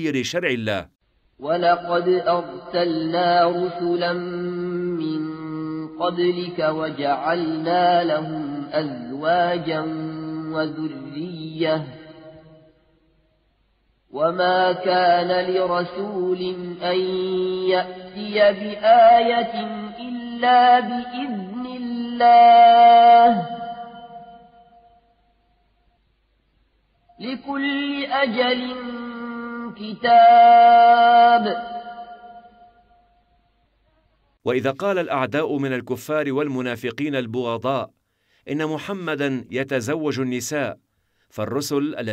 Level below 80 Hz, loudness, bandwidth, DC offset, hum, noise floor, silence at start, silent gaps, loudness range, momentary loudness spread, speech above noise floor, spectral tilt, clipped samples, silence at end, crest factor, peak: -64 dBFS; -19 LUFS; 13 kHz; under 0.1%; none; -65 dBFS; 0 s; none; 13 LU; 19 LU; 47 dB; -5.5 dB/octave; under 0.1%; 0 s; 16 dB; -4 dBFS